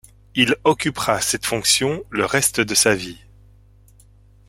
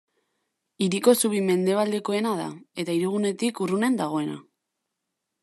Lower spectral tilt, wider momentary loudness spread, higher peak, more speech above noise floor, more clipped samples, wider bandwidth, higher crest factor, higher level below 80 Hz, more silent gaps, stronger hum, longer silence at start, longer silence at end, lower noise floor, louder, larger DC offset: second, -2.5 dB/octave vs -5 dB/octave; second, 7 LU vs 11 LU; about the same, -2 dBFS vs -4 dBFS; second, 31 dB vs 58 dB; neither; first, 16.5 kHz vs 13.5 kHz; about the same, 20 dB vs 22 dB; first, -50 dBFS vs -78 dBFS; neither; first, 50 Hz at -45 dBFS vs none; second, 0.35 s vs 0.8 s; first, 1.3 s vs 1 s; second, -50 dBFS vs -82 dBFS; first, -18 LUFS vs -25 LUFS; neither